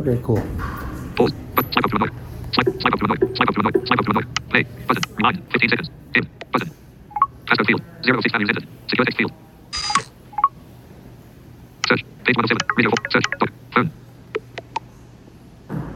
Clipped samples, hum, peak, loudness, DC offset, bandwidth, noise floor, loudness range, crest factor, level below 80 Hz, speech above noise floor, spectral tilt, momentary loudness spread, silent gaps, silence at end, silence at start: under 0.1%; none; 0 dBFS; -20 LUFS; under 0.1%; 16.5 kHz; -44 dBFS; 4 LU; 20 dB; -44 dBFS; 24 dB; -5 dB/octave; 13 LU; none; 0 s; 0 s